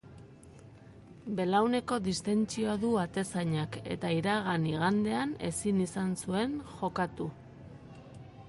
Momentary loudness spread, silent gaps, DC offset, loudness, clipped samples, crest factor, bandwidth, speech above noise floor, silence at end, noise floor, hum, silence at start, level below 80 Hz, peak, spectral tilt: 21 LU; none; under 0.1%; -32 LUFS; under 0.1%; 18 dB; 11.5 kHz; 22 dB; 0 s; -53 dBFS; none; 0.05 s; -60 dBFS; -14 dBFS; -5.5 dB/octave